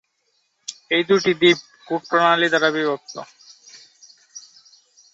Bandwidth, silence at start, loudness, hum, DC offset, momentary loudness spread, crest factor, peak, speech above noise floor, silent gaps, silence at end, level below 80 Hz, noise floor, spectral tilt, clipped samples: 8 kHz; 0.7 s; -19 LUFS; none; under 0.1%; 24 LU; 18 dB; -4 dBFS; 50 dB; none; 0.75 s; -68 dBFS; -68 dBFS; -4 dB/octave; under 0.1%